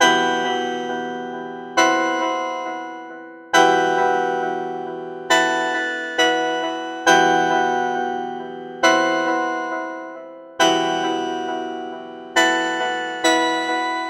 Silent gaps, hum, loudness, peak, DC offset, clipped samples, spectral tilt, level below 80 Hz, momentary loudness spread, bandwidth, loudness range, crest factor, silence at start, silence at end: none; none; -20 LUFS; 0 dBFS; under 0.1%; under 0.1%; -2 dB/octave; -72 dBFS; 15 LU; 15.5 kHz; 3 LU; 20 dB; 0 s; 0 s